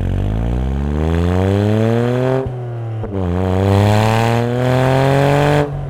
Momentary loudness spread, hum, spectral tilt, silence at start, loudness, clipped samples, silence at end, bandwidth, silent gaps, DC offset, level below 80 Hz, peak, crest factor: 8 LU; none; -7.5 dB/octave; 0 s; -16 LUFS; under 0.1%; 0 s; 15 kHz; none; under 0.1%; -28 dBFS; 0 dBFS; 14 dB